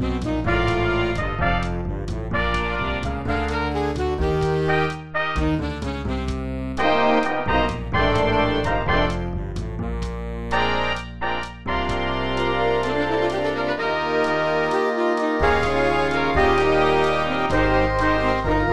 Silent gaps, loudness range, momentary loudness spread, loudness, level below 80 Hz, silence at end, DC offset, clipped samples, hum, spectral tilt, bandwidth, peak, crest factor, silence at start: none; 4 LU; 8 LU; -22 LUFS; -32 dBFS; 0 s; 2%; under 0.1%; none; -6.5 dB/octave; 12 kHz; -6 dBFS; 16 dB; 0 s